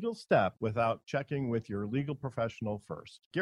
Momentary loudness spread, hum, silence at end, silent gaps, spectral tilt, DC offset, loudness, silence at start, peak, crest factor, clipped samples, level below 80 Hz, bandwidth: 10 LU; none; 0 s; 3.26-3.31 s; -7.5 dB/octave; under 0.1%; -33 LUFS; 0 s; -14 dBFS; 20 dB; under 0.1%; -66 dBFS; 11.5 kHz